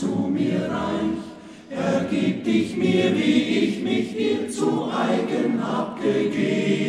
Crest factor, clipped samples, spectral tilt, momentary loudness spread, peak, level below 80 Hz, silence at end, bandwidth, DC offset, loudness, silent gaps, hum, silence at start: 16 dB; under 0.1%; -6 dB/octave; 6 LU; -8 dBFS; -58 dBFS; 0 s; 12 kHz; under 0.1%; -23 LUFS; none; none; 0 s